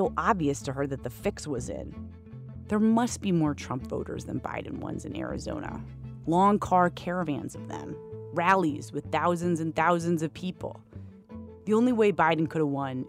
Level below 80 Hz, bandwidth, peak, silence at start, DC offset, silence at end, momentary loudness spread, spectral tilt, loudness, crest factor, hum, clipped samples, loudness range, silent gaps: -52 dBFS; 15.5 kHz; -8 dBFS; 0 s; under 0.1%; 0 s; 17 LU; -6.5 dB/octave; -28 LUFS; 20 dB; none; under 0.1%; 3 LU; none